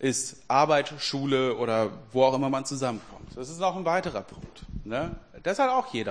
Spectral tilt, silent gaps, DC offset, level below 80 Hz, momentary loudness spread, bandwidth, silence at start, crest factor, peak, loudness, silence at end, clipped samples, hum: -4.5 dB/octave; none; 0.2%; -52 dBFS; 16 LU; 10.5 kHz; 0 s; 20 dB; -8 dBFS; -27 LUFS; 0 s; under 0.1%; none